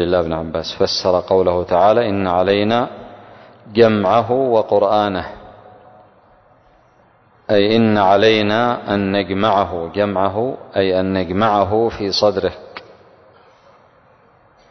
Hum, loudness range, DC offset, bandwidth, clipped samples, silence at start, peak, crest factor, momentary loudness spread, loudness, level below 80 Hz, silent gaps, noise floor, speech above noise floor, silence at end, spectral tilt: none; 4 LU; under 0.1%; 6.4 kHz; under 0.1%; 0 s; 0 dBFS; 16 dB; 9 LU; -16 LUFS; -44 dBFS; none; -52 dBFS; 37 dB; 1.9 s; -6 dB/octave